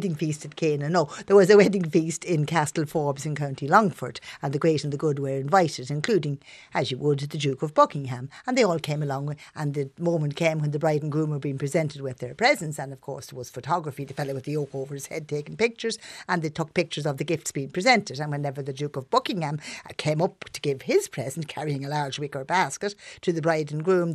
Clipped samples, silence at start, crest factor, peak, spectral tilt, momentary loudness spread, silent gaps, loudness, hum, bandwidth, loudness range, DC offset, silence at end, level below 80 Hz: under 0.1%; 0 s; 22 dB; -4 dBFS; -5.5 dB/octave; 12 LU; none; -26 LUFS; none; 13.5 kHz; 6 LU; under 0.1%; 0 s; -66 dBFS